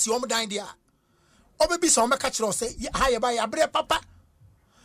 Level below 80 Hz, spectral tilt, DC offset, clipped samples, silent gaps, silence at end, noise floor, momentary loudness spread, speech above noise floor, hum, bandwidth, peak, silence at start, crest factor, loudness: -46 dBFS; -1.5 dB/octave; under 0.1%; under 0.1%; none; 0.85 s; -65 dBFS; 9 LU; 40 dB; none; 15.5 kHz; -10 dBFS; 0 s; 16 dB; -24 LUFS